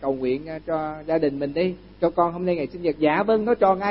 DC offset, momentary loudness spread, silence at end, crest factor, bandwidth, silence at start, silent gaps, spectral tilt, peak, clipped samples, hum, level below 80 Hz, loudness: under 0.1%; 8 LU; 0 s; 16 dB; 5.8 kHz; 0 s; none; -11 dB/octave; -6 dBFS; under 0.1%; none; -52 dBFS; -23 LUFS